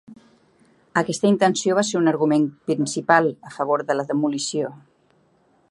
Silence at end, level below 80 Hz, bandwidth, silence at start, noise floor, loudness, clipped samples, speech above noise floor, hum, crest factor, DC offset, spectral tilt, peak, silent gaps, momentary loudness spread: 0.95 s; -70 dBFS; 11.5 kHz; 0.1 s; -61 dBFS; -21 LUFS; under 0.1%; 40 dB; none; 22 dB; under 0.1%; -4.5 dB/octave; 0 dBFS; none; 8 LU